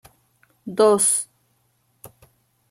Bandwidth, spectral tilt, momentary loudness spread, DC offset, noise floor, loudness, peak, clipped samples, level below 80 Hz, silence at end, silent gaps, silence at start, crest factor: 16.5 kHz; -3 dB/octave; 22 LU; under 0.1%; -66 dBFS; -18 LUFS; -4 dBFS; under 0.1%; -68 dBFS; 0.65 s; none; 0.65 s; 20 dB